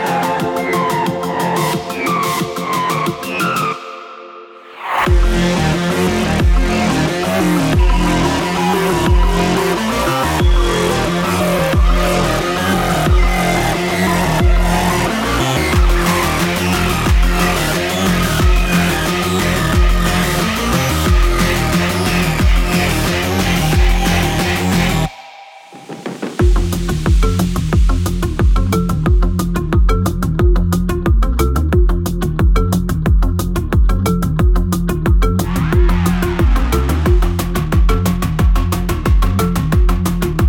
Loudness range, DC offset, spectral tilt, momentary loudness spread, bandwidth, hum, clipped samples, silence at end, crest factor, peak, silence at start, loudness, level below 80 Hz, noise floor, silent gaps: 3 LU; under 0.1%; -5.5 dB/octave; 4 LU; 17.5 kHz; none; under 0.1%; 0 s; 12 dB; -2 dBFS; 0 s; -15 LUFS; -18 dBFS; -37 dBFS; none